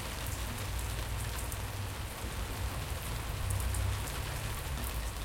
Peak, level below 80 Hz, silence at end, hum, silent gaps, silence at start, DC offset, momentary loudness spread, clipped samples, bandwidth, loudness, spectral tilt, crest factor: -16 dBFS; -40 dBFS; 0 s; none; none; 0 s; under 0.1%; 4 LU; under 0.1%; 17 kHz; -37 LUFS; -4 dB/octave; 20 dB